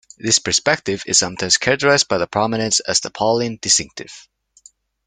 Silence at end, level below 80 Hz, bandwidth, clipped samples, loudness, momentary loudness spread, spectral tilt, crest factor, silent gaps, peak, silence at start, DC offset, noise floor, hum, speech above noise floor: 0.85 s; -54 dBFS; 11 kHz; under 0.1%; -17 LUFS; 5 LU; -2 dB/octave; 20 dB; none; 0 dBFS; 0.25 s; under 0.1%; -51 dBFS; none; 32 dB